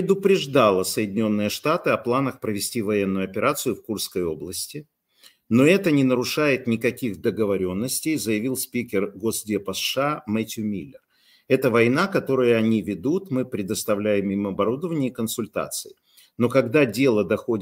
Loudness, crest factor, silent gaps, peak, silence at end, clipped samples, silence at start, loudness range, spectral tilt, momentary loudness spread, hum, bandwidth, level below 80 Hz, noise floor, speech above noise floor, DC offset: -23 LUFS; 18 dB; none; -4 dBFS; 0 s; under 0.1%; 0 s; 4 LU; -5 dB/octave; 9 LU; none; 16 kHz; -62 dBFS; -56 dBFS; 34 dB; under 0.1%